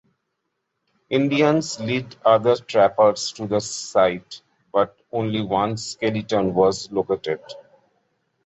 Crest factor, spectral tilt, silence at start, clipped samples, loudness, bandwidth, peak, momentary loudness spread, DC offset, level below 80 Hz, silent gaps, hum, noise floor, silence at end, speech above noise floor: 18 dB; -5 dB/octave; 1.1 s; under 0.1%; -21 LUFS; 8.4 kHz; -4 dBFS; 9 LU; under 0.1%; -58 dBFS; none; none; -77 dBFS; 0.85 s; 56 dB